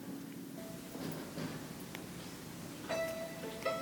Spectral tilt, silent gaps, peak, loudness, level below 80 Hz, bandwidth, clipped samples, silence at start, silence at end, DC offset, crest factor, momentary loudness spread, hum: -4.5 dB/octave; none; -24 dBFS; -43 LUFS; -68 dBFS; 19 kHz; under 0.1%; 0 s; 0 s; under 0.1%; 20 dB; 8 LU; none